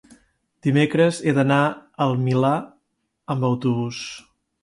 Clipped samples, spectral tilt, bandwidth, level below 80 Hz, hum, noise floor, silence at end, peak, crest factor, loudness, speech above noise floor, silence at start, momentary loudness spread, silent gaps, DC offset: under 0.1%; -6.5 dB/octave; 11.5 kHz; -62 dBFS; none; -72 dBFS; 0.45 s; -6 dBFS; 16 dB; -21 LUFS; 52 dB; 0.65 s; 11 LU; none; under 0.1%